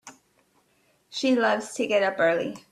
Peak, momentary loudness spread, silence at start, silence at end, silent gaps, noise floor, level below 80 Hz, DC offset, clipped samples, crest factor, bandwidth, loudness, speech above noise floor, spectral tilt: -10 dBFS; 6 LU; 0.05 s; 0.15 s; none; -66 dBFS; -74 dBFS; under 0.1%; under 0.1%; 18 dB; 13 kHz; -24 LUFS; 42 dB; -3.5 dB/octave